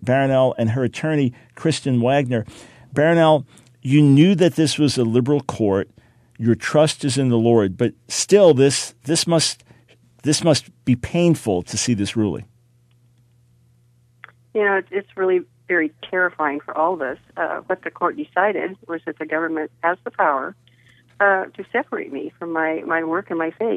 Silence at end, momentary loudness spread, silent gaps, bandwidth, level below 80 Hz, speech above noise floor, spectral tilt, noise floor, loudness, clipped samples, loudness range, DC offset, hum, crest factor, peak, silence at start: 0 s; 11 LU; none; 14 kHz; -56 dBFS; 38 dB; -5 dB/octave; -57 dBFS; -19 LUFS; under 0.1%; 7 LU; under 0.1%; none; 18 dB; -2 dBFS; 0 s